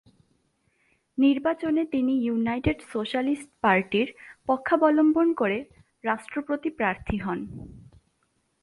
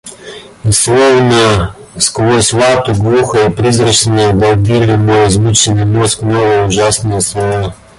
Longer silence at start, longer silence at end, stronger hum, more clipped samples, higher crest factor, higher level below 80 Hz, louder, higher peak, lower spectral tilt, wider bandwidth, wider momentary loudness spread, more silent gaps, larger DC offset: first, 1.15 s vs 0.05 s; first, 0.85 s vs 0.25 s; neither; neither; first, 18 dB vs 10 dB; second, -50 dBFS vs -32 dBFS; second, -25 LUFS vs -10 LUFS; second, -8 dBFS vs 0 dBFS; first, -7 dB/octave vs -4.5 dB/octave; about the same, 11.5 kHz vs 12 kHz; first, 12 LU vs 7 LU; neither; neither